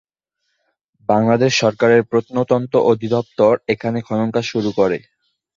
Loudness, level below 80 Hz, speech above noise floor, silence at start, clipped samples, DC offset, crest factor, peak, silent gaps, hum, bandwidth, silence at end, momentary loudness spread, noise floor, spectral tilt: -17 LUFS; -56 dBFS; 57 dB; 1.1 s; under 0.1%; under 0.1%; 16 dB; -2 dBFS; none; none; 7.6 kHz; 0.6 s; 7 LU; -73 dBFS; -5.5 dB/octave